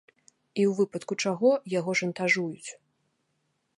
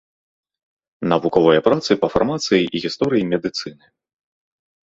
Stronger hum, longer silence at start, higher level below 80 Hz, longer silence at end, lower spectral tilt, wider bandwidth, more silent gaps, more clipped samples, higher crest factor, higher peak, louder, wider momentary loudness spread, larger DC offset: neither; second, 0.55 s vs 1 s; second, -78 dBFS vs -52 dBFS; about the same, 1.05 s vs 1.15 s; about the same, -5 dB/octave vs -5.5 dB/octave; first, 11.5 kHz vs 8 kHz; neither; neither; about the same, 18 dB vs 20 dB; second, -10 dBFS vs 0 dBFS; second, -27 LUFS vs -18 LUFS; about the same, 12 LU vs 11 LU; neither